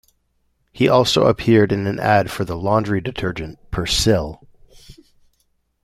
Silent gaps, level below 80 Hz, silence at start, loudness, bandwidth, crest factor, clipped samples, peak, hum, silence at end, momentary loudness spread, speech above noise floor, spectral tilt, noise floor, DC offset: none; -40 dBFS; 0.75 s; -18 LUFS; 15.5 kHz; 18 dB; under 0.1%; -2 dBFS; none; 0.9 s; 11 LU; 48 dB; -5 dB/octave; -66 dBFS; under 0.1%